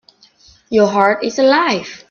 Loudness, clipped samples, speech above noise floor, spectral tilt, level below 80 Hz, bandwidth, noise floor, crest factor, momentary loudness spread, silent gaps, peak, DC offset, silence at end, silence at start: -14 LUFS; under 0.1%; 35 dB; -4.5 dB/octave; -58 dBFS; 7.2 kHz; -49 dBFS; 16 dB; 6 LU; none; 0 dBFS; under 0.1%; 0.15 s; 0.7 s